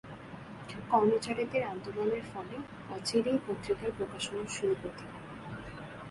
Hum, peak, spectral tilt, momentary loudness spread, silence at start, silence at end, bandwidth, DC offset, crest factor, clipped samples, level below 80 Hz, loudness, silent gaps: none; -14 dBFS; -5 dB/octave; 16 LU; 0.05 s; 0 s; 11.5 kHz; under 0.1%; 22 dB; under 0.1%; -60 dBFS; -34 LUFS; none